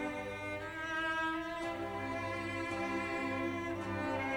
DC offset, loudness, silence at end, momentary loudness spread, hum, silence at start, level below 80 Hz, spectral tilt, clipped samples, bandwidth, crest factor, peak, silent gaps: under 0.1%; -38 LUFS; 0 s; 5 LU; 50 Hz at -60 dBFS; 0 s; -62 dBFS; -5.5 dB/octave; under 0.1%; 20 kHz; 12 dB; -26 dBFS; none